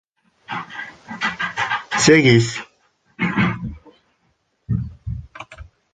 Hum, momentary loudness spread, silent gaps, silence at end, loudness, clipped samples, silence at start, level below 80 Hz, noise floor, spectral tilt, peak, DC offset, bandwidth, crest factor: none; 21 LU; none; 0.3 s; -19 LUFS; under 0.1%; 0.5 s; -42 dBFS; -66 dBFS; -4.5 dB/octave; -2 dBFS; under 0.1%; 9.6 kHz; 20 dB